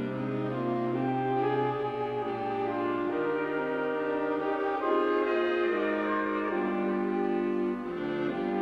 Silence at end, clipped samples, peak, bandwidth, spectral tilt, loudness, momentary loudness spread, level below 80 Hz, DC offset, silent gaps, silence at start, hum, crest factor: 0 s; under 0.1%; -16 dBFS; 6 kHz; -8 dB/octave; -30 LUFS; 5 LU; -64 dBFS; under 0.1%; none; 0 s; none; 14 dB